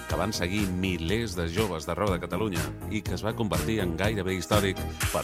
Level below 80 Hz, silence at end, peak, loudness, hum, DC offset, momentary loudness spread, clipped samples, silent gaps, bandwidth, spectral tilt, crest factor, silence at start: -40 dBFS; 0 s; -10 dBFS; -29 LUFS; none; under 0.1%; 5 LU; under 0.1%; none; 16 kHz; -5 dB/octave; 18 dB; 0 s